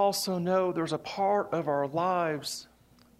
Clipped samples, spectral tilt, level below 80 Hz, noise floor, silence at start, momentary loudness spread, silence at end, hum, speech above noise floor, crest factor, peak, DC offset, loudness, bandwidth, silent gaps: under 0.1%; -4.5 dB/octave; -70 dBFS; -60 dBFS; 0 s; 6 LU; 0.55 s; none; 32 dB; 14 dB; -14 dBFS; under 0.1%; -29 LUFS; 16 kHz; none